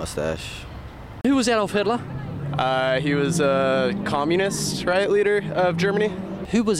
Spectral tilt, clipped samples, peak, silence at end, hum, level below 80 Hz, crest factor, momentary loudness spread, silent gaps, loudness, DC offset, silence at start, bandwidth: -5 dB/octave; under 0.1%; -6 dBFS; 0 s; none; -46 dBFS; 16 dB; 12 LU; none; -22 LUFS; under 0.1%; 0 s; 15.5 kHz